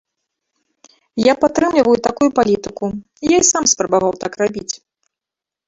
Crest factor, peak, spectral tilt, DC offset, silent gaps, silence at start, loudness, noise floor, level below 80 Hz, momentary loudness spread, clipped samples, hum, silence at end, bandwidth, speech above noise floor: 16 dB; -2 dBFS; -3 dB/octave; under 0.1%; none; 1.15 s; -16 LUFS; -87 dBFS; -50 dBFS; 13 LU; under 0.1%; none; 0.9 s; 8 kHz; 71 dB